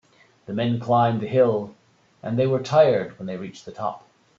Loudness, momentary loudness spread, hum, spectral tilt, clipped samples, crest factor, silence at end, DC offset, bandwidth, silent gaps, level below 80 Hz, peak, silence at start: -22 LUFS; 17 LU; none; -7.5 dB/octave; under 0.1%; 18 dB; 0.4 s; under 0.1%; 7.6 kHz; none; -64 dBFS; -4 dBFS; 0.5 s